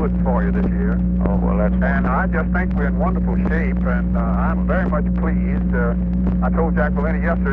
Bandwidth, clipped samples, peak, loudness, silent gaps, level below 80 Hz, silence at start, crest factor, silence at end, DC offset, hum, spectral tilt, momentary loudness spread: 3.5 kHz; under 0.1%; -4 dBFS; -19 LUFS; none; -22 dBFS; 0 s; 12 dB; 0 s; under 0.1%; 60 Hz at -20 dBFS; -11.5 dB/octave; 2 LU